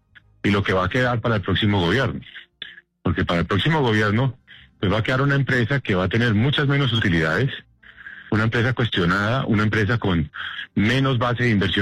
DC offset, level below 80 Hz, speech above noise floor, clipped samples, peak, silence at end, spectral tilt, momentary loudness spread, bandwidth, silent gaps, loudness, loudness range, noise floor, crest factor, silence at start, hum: under 0.1%; -46 dBFS; 23 dB; under 0.1%; -10 dBFS; 0 s; -7 dB/octave; 9 LU; 10 kHz; none; -21 LUFS; 2 LU; -43 dBFS; 10 dB; 0.45 s; none